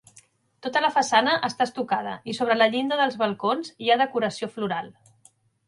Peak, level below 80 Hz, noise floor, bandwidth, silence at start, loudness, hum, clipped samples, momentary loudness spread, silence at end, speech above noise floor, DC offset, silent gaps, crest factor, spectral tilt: -4 dBFS; -72 dBFS; -60 dBFS; 11.5 kHz; 0.65 s; -24 LUFS; none; under 0.1%; 10 LU; 0.75 s; 36 dB; under 0.1%; none; 20 dB; -3.5 dB/octave